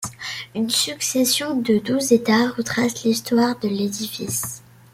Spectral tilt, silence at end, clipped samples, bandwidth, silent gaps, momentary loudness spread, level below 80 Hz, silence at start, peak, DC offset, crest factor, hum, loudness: -3.5 dB/octave; 0.35 s; under 0.1%; 16.5 kHz; none; 10 LU; -60 dBFS; 0 s; -4 dBFS; under 0.1%; 18 dB; none; -21 LUFS